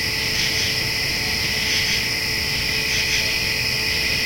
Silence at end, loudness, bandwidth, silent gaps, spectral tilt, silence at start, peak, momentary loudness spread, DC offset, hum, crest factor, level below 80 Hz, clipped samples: 0 s; -19 LUFS; 16.5 kHz; none; -1.5 dB/octave; 0 s; -8 dBFS; 2 LU; under 0.1%; none; 14 dB; -40 dBFS; under 0.1%